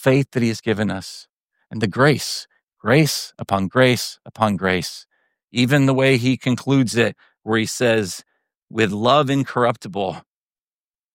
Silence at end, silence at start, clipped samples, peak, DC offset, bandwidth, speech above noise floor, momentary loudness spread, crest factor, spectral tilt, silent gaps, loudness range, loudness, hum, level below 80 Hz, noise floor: 0.95 s; 0 s; under 0.1%; -2 dBFS; under 0.1%; 16.5 kHz; over 71 dB; 13 LU; 18 dB; -5.5 dB/octave; 1.29-1.41 s, 2.63-2.67 s, 5.44-5.48 s, 8.57-8.62 s; 2 LU; -19 LUFS; none; -58 dBFS; under -90 dBFS